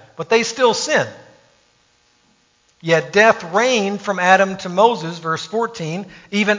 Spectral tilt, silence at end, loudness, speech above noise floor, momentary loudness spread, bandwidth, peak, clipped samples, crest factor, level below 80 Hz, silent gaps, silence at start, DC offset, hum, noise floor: -3.5 dB/octave; 0 s; -17 LUFS; 42 dB; 11 LU; 7.6 kHz; 0 dBFS; under 0.1%; 18 dB; -64 dBFS; none; 0.2 s; under 0.1%; none; -59 dBFS